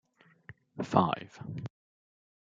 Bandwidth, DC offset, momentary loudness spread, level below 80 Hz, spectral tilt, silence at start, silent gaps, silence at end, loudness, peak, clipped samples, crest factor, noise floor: 7.8 kHz; under 0.1%; 18 LU; -70 dBFS; -7.5 dB/octave; 0.5 s; none; 0.9 s; -32 LUFS; -8 dBFS; under 0.1%; 28 dB; -56 dBFS